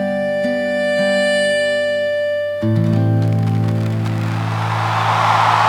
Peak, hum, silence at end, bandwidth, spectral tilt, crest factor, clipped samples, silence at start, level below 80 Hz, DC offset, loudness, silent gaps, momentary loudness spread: -2 dBFS; none; 0 s; 12 kHz; -6 dB/octave; 14 dB; under 0.1%; 0 s; -54 dBFS; under 0.1%; -17 LUFS; none; 5 LU